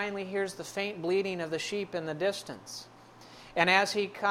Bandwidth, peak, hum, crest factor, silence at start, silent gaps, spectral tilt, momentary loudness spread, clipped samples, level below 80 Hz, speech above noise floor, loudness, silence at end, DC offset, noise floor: 16 kHz; -8 dBFS; none; 24 dB; 0 s; none; -3.5 dB/octave; 17 LU; under 0.1%; -70 dBFS; 21 dB; -30 LUFS; 0 s; under 0.1%; -52 dBFS